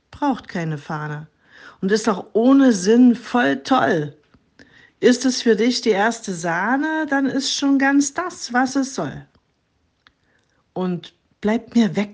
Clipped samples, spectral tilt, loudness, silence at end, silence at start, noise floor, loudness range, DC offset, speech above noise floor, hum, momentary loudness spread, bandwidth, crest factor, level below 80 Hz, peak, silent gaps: under 0.1%; -4.5 dB/octave; -19 LUFS; 0 s; 0.1 s; -66 dBFS; 8 LU; under 0.1%; 48 dB; none; 13 LU; 9.8 kHz; 18 dB; -62 dBFS; -2 dBFS; none